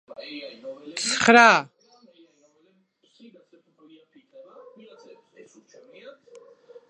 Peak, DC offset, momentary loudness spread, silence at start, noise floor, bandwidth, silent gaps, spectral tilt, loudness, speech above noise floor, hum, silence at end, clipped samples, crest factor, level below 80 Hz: 0 dBFS; under 0.1%; 26 LU; 0.2 s; -65 dBFS; 11.5 kHz; none; -2.5 dB/octave; -18 LUFS; 45 dB; none; 0.8 s; under 0.1%; 26 dB; -70 dBFS